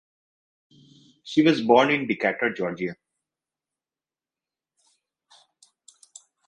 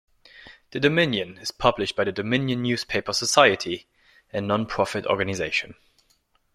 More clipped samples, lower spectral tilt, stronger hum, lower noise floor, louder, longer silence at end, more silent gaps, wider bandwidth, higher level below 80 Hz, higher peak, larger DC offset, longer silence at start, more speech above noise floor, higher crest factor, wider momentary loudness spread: neither; first, -5.5 dB/octave vs -4 dB/octave; neither; first, under -90 dBFS vs -66 dBFS; about the same, -22 LUFS vs -23 LUFS; first, 3.55 s vs 0.85 s; neither; second, 10.5 kHz vs 15.5 kHz; second, -70 dBFS vs -54 dBFS; second, -4 dBFS vs 0 dBFS; neither; first, 1.25 s vs 0.35 s; first, over 68 dB vs 43 dB; about the same, 24 dB vs 24 dB; about the same, 11 LU vs 13 LU